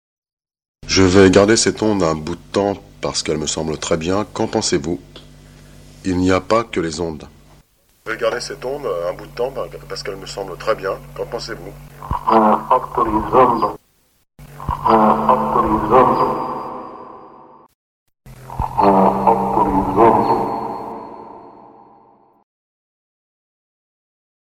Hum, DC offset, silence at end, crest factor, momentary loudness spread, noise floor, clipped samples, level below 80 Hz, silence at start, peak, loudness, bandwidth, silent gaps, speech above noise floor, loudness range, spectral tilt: none; under 0.1%; 2.95 s; 18 dB; 17 LU; -60 dBFS; under 0.1%; -40 dBFS; 0.85 s; 0 dBFS; -17 LUFS; 16.5 kHz; 17.74-18.06 s; 43 dB; 9 LU; -5 dB/octave